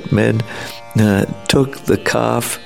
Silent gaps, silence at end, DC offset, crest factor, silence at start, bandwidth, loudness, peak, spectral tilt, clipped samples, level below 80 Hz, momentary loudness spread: none; 0 s; 0.9%; 16 dB; 0 s; 16.5 kHz; -16 LUFS; 0 dBFS; -5.5 dB/octave; under 0.1%; -42 dBFS; 7 LU